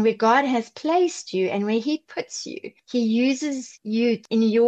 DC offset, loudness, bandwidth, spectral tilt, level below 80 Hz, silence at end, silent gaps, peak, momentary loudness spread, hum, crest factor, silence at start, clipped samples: under 0.1%; -23 LUFS; 8.6 kHz; -4.5 dB/octave; -78 dBFS; 0 s; none; -6 dBFS; 12 LU; none; 16 dB; 0 s; under 0.1%